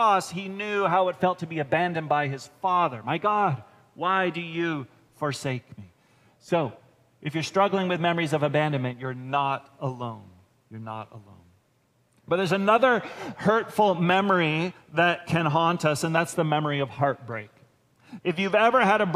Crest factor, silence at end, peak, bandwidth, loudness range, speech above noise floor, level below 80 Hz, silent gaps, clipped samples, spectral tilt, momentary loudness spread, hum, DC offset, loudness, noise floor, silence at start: 20 dB; 0 s; -6 dBFS; 15.5 kHz; 7 LU; 42 dB; -70 dBFS; none; under 0.1%; -5.5 dB/octave; 14 LU; none; under 0.1%; -25 LUFS; -67 dBFS; 0 s